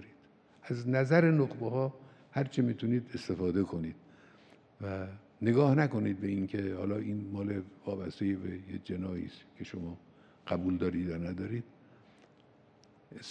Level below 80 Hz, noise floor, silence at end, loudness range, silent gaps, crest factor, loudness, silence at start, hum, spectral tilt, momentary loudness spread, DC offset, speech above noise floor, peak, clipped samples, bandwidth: -66 dBFS; -62 dBFS; 0 s; 7 LU; none; 22 dB; -33 LUFS; 0 s; none; -8.5 dB/octave; 18 LU; under 0.1%; 30 dB; -12 dBFS; under 0.1%; 9.2 kHz